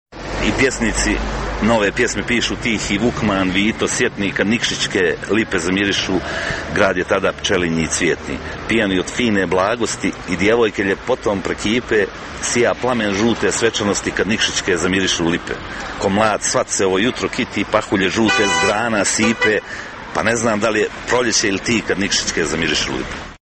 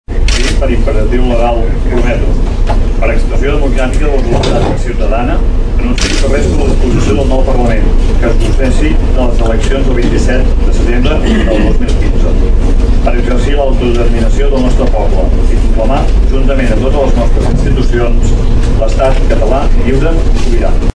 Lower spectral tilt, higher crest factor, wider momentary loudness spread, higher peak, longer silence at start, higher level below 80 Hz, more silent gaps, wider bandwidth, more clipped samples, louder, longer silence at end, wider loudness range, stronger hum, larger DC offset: second, -3.5 dB/octave vs -6.5 dB/octave; first, 18 dB vs 8 dB; first, 6 LU vs 2 LU; about the same, 0 dBFS vs 0 dBFS; about the same, 0.1 s vs 0.1 s; second, -36 dBFS vs -8 dBFS; neither; first, 12.5 kHz vs 9.8 kHz; second, under 0.1% vs 0.5%; second, -17 LUFS vs -12 LUFS; about the same, 0.1 s vs 0.05 s; about the same, 2 LU vs 1 LU; neither; neither